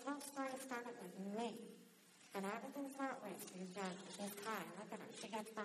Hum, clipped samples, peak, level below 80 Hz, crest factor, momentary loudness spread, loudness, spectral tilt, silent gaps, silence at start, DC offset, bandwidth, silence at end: none; under 0.1%; -32 dBFS; under -90 dBFS; 18 dB; 6 LU; -49 LUFS; -4 dB/octave; none; 0 s; under 0.1%; 13.5 kHz; 0 s